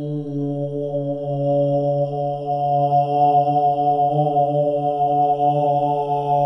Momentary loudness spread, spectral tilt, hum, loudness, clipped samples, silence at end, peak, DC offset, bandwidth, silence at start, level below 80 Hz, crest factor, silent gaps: 8 LU; -10 dB/octave; none; -19 LUFS; under 0.1%; 0 s; -6 dBFS; under 0.1%; 5.8 kHz; 0 s; -64 dBFS; 12 dB; none